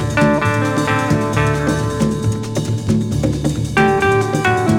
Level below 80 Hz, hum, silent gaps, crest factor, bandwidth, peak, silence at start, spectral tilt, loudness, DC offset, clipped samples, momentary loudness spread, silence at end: -34 dBFS; none; none; 16 dB; 16 kHz; 0 dBFS; 0 s; -6 dB/octave; -16 LUFS; under 0.1%; under 0.1%; 5 LU; 0 s